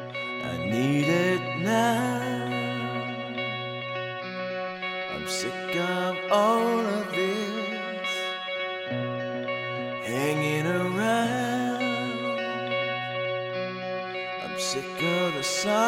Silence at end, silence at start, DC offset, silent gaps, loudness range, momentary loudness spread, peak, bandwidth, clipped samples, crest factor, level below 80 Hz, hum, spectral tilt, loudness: 0 s; 0 s; under 0.1%; none; 4 LU; 9 LU; -8 dBFS; 16 kHz; under 0.1%; 20 dB; -66 dBFS; none; -4.5 dB/octave; -28 LUFS